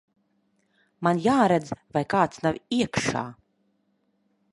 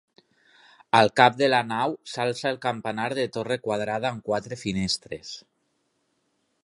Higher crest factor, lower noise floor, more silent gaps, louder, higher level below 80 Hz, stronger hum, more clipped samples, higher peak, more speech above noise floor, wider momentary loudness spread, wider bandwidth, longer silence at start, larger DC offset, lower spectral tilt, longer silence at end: second, 20 dB vs 26 dB; about the same, -71 dBFS vs -73 dBFS; neither; about the same, -25 LUFS vs -25 LUFS; about the same, -58 dBFS vs -60 dBFS; neither; neither; second, -6 dBFS vs -2 dBFS; about the same, 47 dB vs 48 dB; about the same, 9 LU vs 11 LU; about the same, 11.5 kHz vs 11.5 kHz; about the same, 1 s vs 0.95 s; neither; about the same, -5.5 dB/octave vs -4.5 dB/octave; about the same, 1.2 s vs 1.25 s